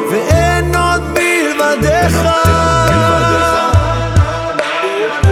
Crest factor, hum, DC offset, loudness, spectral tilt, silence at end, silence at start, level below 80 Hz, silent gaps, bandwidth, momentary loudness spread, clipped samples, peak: 12 dB; none; under 0.1%; -12 LUFS; -5 dB/octave; 0 s; 0 s; -24 dBFS; none; 16 kHz; 5 LU; under 0.1%; 0 dBFS